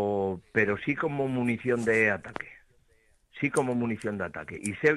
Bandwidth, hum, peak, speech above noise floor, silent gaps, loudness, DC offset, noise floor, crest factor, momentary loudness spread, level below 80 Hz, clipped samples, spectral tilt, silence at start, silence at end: 12.5 kHz; none; -10 dBFS; 37 dB; none; -28 LUFS; under 0.1%; -65 dBFS; 18 dB; 11 LU; -64 dBFS; under 0.1%; -6 dB/octave; 0 s; 0 s